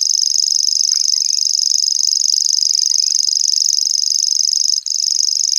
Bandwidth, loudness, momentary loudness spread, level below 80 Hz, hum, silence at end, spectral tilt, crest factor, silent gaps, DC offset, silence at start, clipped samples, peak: over 20 kHz; -12 LUFS; 1 LU; -72 dBFS; none; 0 s; 8.5 dB/octave; 16 dB; none; under 0.1%; 0 s; under 0.1%; 0 dBFS